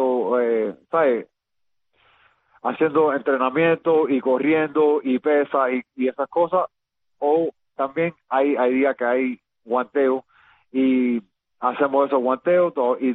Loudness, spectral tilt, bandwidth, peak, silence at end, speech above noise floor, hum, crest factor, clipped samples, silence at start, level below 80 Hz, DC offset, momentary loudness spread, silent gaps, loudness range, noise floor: -21 LUFS; -9 dB/octave; 4 kHz; -6 dBFS; 0 s; 58 dB; none; 14 dB; under 0.1%; 0 s; -68 dBFS; under 0.1%; 8 LU; none; 3 LU; -78 dBFS